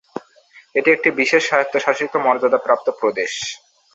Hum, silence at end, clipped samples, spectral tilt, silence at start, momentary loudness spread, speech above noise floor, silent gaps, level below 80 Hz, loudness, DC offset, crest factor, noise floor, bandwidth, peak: none; 0.4 s; under 0.1%; -3 dB/octave; 0.15 s; 12 LU; 32 dB; none; -66 dBFS; -18 LUFS; under 0.1%; 18 dB; -50 dBFS; 8 kHz; -2 dBFS